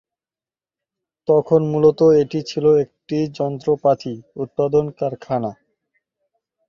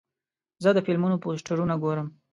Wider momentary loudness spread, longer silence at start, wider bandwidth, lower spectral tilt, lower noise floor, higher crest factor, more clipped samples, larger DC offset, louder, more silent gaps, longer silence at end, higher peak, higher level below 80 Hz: first, 12 LU vs 6 LU; first, 1.3 s vs 0.6 s; second, 7.2 kHz vs 11.5 kHz; about the same, -8 dB/octave vs -7.5 dB/octave; about the same, under -90 dBFS vs under -90 dBFS; about the same, 18 dB vs 18 dB; neither; neither; first, -18 LUFS vs -26 LUFS; neither; first, 1.15 s vs 0.25 s; first, -2 dBFS vs -8 dBFS; first, -56 dBFS vs -62 dBFS